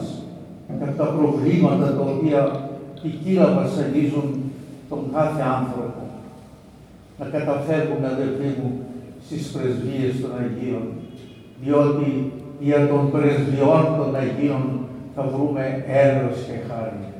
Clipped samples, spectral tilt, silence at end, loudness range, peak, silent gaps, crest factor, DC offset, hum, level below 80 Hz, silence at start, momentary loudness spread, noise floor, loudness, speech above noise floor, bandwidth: under 0.1%; -8.5 dB/octave; 0 s; 6 LU; -2 dBFS; none; 18 dB; under 0.1%; none; -58 dBFS; 0 s; 16 LU; -45 dBFS; -22 LUFS; 25 dB; 11.5 kHz